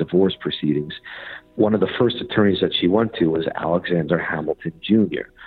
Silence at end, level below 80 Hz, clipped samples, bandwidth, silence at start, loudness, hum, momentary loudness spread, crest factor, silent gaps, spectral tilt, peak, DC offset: 0 s; -52 dBFS; under 0.1%; 4.7 kHz; 0 s; -20 LUFS; none; 10 LU; 16 dB; none; -9.5 dB/octave; -4 dBFS; under 0.1%